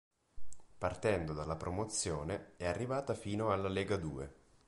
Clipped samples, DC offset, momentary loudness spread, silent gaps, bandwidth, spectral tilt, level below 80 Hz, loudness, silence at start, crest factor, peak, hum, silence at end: under 0.1%; under 0.1%; 7 LU; none; 11.5 kHz; -5 dB/octave; -54 dBFS; -38 LUFS; 0.35 s; 18 dB; -20 dBFS; none; 0.1 s